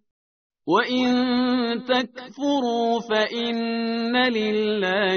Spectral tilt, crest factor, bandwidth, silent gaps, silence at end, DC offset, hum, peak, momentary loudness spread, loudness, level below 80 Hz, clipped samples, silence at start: -2 dB/octave; 16 dB; 6.6 kHz; none; 0 s; under 0.1%; none; -6 dBFS; 4 LU; -22 LUFS; -64 dBFS; under 0.1%; 0.65 s